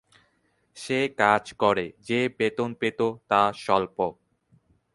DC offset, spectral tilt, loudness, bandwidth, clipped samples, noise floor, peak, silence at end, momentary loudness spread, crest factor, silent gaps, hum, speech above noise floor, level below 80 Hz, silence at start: under 0.1%; -5 dB/octave; -25 LUFS; 11.5 kHz; under 0.1%; -69 dBFS; -4 dBFS; 0.8 s; 7 LU; 22 dB; none; none; 44 dB; -62 dBFS; 0.75 s